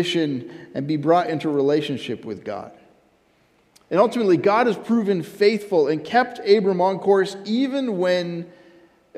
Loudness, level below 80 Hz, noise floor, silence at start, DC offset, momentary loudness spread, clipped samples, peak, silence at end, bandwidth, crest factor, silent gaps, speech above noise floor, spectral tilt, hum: -21 LUFS; -70 dBFS; -60 dBFS; 0 s; under 0.1%; 13 LU; under 0.1%; -4 dBFS; 0 s; 13.5 kHz; 18 dB; none; 40 dB; -6 dB/octave; none